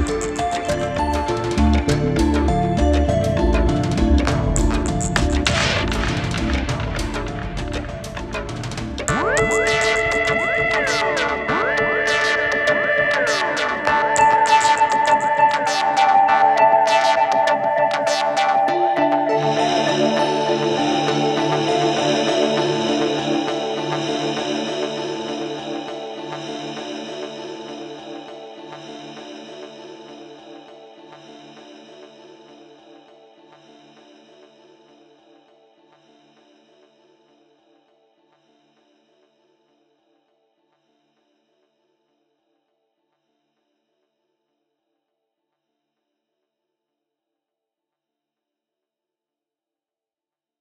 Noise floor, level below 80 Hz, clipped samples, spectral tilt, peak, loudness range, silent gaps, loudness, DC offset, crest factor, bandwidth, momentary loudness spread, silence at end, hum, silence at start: under -90 dBFS; -32 dBFS; under 0.1%; -4.5 dB/octave; -2 dBFS; 17 LU; none; -19 LUFS; under 0.1%; 20 dB; 13.5 kHz; 17 LU; 18.05 s; none; 0 s